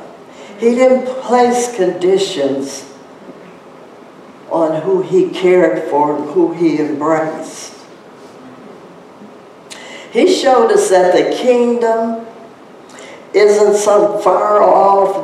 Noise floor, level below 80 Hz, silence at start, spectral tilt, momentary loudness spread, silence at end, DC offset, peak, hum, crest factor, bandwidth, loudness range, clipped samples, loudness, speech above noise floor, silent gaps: -37 dBFS; -62 dBFS; 0 s; -4.5 dB/octave; 19 LU; 0 s; under 0.1%; 0 dBFS; none; 14 dB; 13.5 kHz; 6 LU; under 0.1%; -13 LUFS; 25 dB; none